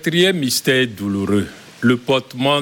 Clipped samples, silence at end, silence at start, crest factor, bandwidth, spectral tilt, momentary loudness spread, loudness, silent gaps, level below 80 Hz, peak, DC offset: under 0.1%; 0 s; 0 s; 14 dB; 17.5 kHz; -4.5 dB/octave; 6 LU; -18 LUFS; none; -54 dBFS; -2 dBFS; under 0.1%